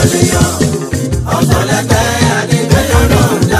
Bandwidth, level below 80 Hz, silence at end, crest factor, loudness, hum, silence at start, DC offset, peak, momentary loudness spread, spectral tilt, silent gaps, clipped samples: 16 kHz; -22 dBFS; 0 s; 10 dB; -11 LUFS; none; 0 s; under 0.1%; 0 dBFS; 5 LU; -5 dB/octave; none; under 0.1%